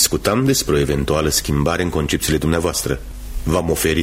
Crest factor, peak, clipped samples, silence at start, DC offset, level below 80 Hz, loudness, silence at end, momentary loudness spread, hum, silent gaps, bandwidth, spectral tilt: 18 dB; 0 dBFS; under 0.1%; 0 s; under 0.1%; -30 dBFS; -18 LUFS; 0 s; 7 LU; none; none; 16.5 kHz; -4 dB/octave